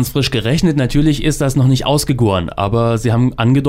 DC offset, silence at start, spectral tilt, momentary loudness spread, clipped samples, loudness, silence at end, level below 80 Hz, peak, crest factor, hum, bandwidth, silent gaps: under 0.1%; 0 s; -6 dB/octave; 2 LU; under 0.1%; -15 LUFS; 0 s; -30 dBFS; -4 dBFS; 10 dB; none; 16 kHz; none